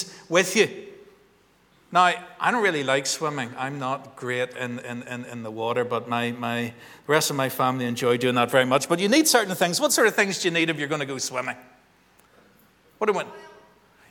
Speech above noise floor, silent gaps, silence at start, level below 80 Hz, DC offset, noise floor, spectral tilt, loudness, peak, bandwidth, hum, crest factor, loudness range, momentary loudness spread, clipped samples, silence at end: 36 dB; none; 0 s; -72 dBFS; under 0.1%; -60 dBFS; -3 dB/octave; -23 LUFS; -4 dBFS; over 20 kHz; none; 22 dB; 8 LU; 13 LU; under 0.1%; 0.6 s